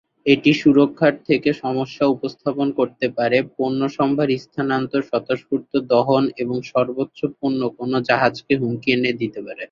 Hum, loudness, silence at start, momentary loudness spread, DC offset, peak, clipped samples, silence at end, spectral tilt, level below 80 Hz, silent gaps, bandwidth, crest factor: none; -20 LUFS; 0.25 s; 8 LU; under 0.1%; -2 dBFS; under 0.1%; 0.05 s; -7 dB/octave; -60 dBFS; none; 7.2 kHz; 18 dB